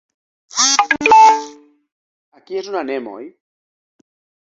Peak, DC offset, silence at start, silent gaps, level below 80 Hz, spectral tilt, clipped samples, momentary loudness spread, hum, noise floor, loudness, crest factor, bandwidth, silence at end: 0 dBFS; under 0.1%; 0.55 s; 1.92-2.32 s; -62 dBFS; 0 dB/octave; under 0.1%; 23 LU; none; -38 dBFS; -13 LUFS; 18 dB; 8 kHz; 1.2 s